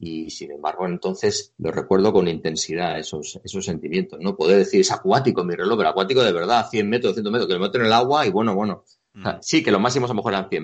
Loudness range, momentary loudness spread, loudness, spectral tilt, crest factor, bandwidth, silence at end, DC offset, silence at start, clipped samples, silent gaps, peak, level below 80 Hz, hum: 4 LU; 11 LU; -21 LUFS; -4.5 dB/octave; 18 dB; 8.6 kHz; 0 s; under 0.1%; 0 s; under 0.1%; none; -2 dBFS; -58 dBFS; none